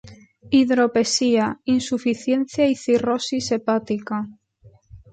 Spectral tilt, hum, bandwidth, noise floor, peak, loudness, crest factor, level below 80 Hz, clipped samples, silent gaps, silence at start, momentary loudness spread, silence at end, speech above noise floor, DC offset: -4 dB/octave; none; 9.2 kHz; -53 dBFS; -6 dBFS; -21 LUFS; 14 dB; -56 dBFS; under 0.1%; none; 0.05 s; 8 LU; 0.15 s; 33 dB; under 0.1%